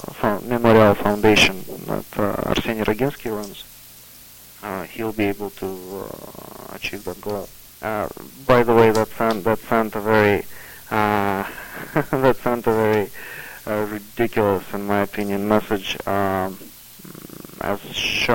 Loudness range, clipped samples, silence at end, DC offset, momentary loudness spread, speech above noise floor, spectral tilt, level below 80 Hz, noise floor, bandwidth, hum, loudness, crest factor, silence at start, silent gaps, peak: 10 LU; under 0.1%; 0 s; under 0.1%; 22 LU; 24 dB; -5 dB/octave; -44 dBFS; -44 dBFS; 17 kHz; none; -21 LUFS; 20 dB; 0 s; none; 0 dBFS